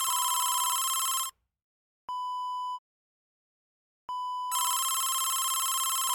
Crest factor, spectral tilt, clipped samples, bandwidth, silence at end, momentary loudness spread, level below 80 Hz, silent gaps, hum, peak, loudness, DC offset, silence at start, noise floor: 16 dB; 5.5 dB/octave; under 0.1%; over 20 kHz; 0 s; 11 LU; -78 dBFS; 1.64-2.08 s, 2.79-4.08 s; none; -16 dBFS; -28 LUFS; under 0.1%; 0 s; under -90 dBFS